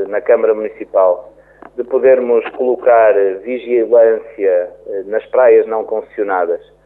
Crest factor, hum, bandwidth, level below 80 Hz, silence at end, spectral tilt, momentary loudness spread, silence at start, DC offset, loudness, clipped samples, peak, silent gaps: 12 dB; none; 3.8 kHz; -58 dBFS; 0.3 s; -8.5 dB/octave; 12 LU; 0 s; under 0.1%; -14 LUFS; under 0.1%; -2 dBFS; none